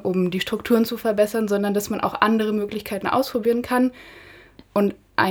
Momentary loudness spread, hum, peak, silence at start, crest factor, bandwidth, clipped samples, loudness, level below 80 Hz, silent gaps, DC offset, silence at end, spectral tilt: 6 LU; none; 0 dBFS; 0 s; 22 dB; over 20 kHz; under 0.1%; -22 LUFS; -56 dBFS; none; under 0.1%; 0 s; -5.5 dB/octave